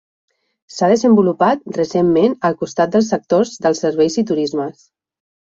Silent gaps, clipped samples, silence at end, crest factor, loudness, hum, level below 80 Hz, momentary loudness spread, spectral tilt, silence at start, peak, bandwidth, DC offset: none; under 0.1%; 0.7 s; 14 dB; -16 LUFS; none; -58 dBFS; 7 LU; -6 dB/octave; 0.75 s; -2 dBFS; 7.8 kHz; under 0.1%